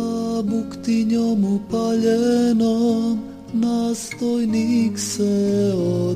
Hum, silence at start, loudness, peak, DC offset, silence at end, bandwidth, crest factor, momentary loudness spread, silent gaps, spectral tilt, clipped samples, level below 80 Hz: none; 0 s; -20 LUFS; -8 dBFS; under 0.1%; 0 s; 15 kHz; 12 dB; 7 LU; none; -6 dB/octave; under 0.1%; -56 dBFS